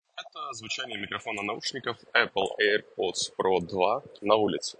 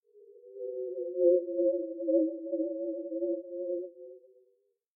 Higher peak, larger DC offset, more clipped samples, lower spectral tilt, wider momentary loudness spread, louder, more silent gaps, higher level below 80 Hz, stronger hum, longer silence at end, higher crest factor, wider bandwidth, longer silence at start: first, -4 dBFS vs -14 dBFS; neither; neither; second, -3 dB/octave vs -11 dB/octave; second, 10 LU vs 17 LU; first, -28 LUFS vs -32 LUFS; neither; first, -72 dBFS vs under -90 dBFS; neither; second, 0.1 s vs 0.8 s; first, 24 dB vs 18 dB; first, 10 kHz vs 0.7 kHz; about the same, 0.15 s vs 0.15 s